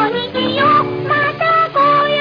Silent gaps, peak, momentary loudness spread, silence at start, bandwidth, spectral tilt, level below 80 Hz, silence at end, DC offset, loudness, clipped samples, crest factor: none; -2 dBFS; 5 LU; 0 s; 5.2 kHz; -7 dB/octave; -52 dBFS; 0 s; under 0.1%; -14 LUFS; under 0.1%; 12 dB